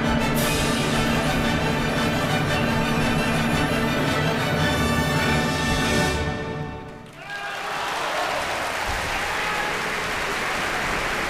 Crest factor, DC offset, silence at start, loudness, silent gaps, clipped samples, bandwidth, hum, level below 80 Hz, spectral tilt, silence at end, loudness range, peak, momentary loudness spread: 14 dB; under 0.1%; 0 s; -23 LUFS; none; under 0.1%; 15.5 kHz; none; -36 dBFS; -4.5 dB/octave; 0 s; 4 LU; -10 dBFS; 7 LU